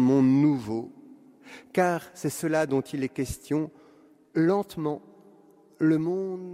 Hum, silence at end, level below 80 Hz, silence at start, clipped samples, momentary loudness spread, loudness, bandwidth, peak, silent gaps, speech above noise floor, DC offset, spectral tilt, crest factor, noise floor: none; 0 s; -56 dBFS; 0 s; under 0.1%; 13 LU; -27 LUFS; 15.5 kHz; -10 dBFS; none; 31 dB; under 0.1%; -7 dB/octave; 18 dB; -57 dBFS